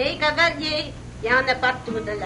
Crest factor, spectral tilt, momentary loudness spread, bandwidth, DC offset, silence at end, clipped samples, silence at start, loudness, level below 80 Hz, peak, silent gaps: 18 dB; -4 dB/octave; 10 LU; 10.5 kHz; under 0.1%; 0 s; under 0.1%; 0 s; -21 LUFS; -44 dBFS; -4 dBFS; none